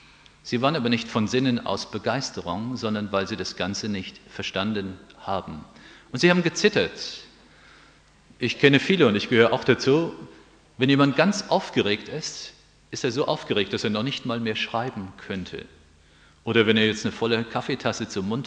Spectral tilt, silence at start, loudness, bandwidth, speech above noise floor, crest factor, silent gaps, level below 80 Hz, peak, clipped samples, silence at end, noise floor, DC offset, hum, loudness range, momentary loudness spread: -5 dB/octave; 0.45 s; -24 LUFS; 9.8 kHz; 31 dB; 24 dB; none; -58 dBFS; -2 dBFS; under 0.1%; 0 s; -55 dBFS; under 0.1%; none; 7 LU; 15 LU